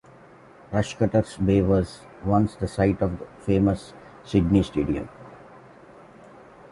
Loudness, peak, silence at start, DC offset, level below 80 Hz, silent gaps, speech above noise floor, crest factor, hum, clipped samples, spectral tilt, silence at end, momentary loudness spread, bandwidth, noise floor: -24 LUFS; -6 dBFS; 0.7 s; under 0.1%; -42 dBFS; none; 27 dB; 20 dB; none; under 0.1%; -8 dB/octave; 1.35 s; 14 LU; 11.5 kHz; -49 dBFS